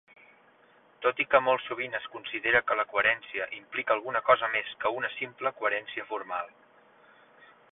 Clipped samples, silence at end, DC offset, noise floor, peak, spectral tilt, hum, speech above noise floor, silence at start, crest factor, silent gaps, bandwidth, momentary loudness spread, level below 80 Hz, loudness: under 0.1%; 1.25 s; under 0.1%; -61 dBFS; -8 dBFS; -7 dB/octave; none; 32 dB; 1 s; 22 dB; none; 4 kHz; 12 LU; -68 dBFS; -28 LUFS